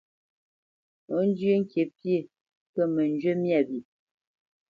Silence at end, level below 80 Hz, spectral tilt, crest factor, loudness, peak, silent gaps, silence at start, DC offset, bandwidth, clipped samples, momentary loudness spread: 0.9 s; -76 dBFS; -9.5 dB/octave; 16 dB; -27 LUFS; -12 dBFS; 2.41-2.45 s, 2.57-2.74 s; 1.1 s; under 0.1%; 6.8 kHz; under 0.1%; 7 LU